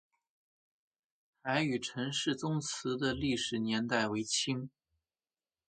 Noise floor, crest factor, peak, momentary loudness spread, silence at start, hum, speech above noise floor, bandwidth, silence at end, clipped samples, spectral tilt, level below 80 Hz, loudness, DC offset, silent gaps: under -90 dBFS; 22 dB; -14 dBFS; 4 LU; 1.45 s; none; over 56 dB; 9.4 kHz; 1 s; under 0.1%; -4 dB/octave; -64 dBFS; -34 LUFS; under 0.1%; none